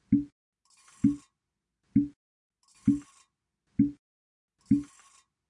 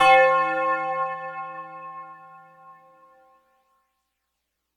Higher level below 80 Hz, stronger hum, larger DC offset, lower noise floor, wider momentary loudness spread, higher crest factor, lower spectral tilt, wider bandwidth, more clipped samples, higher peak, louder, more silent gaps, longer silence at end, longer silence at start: first, -58 dBFS vs -70 dBFS; neither; neither; first, -86 dBFS vs -79 dBFS; second, 9 LU vs 24 LU; about the same, 20 dB vs 22 dB; first, -8.5 dB/octave vs -3 dB/octave; about the same, 10.5 kHz vs 11 kHz; neither; second, -12 dBFS vs -4 dBFS; second, -30 LUFS vs -22 LUFS; first, 0.32-0.53 s, 2.16-2.50 s, 3.99-4.48 s vs none; second, 0.65 s vs 2.05 s; about the same, 0.1 s vs 0 s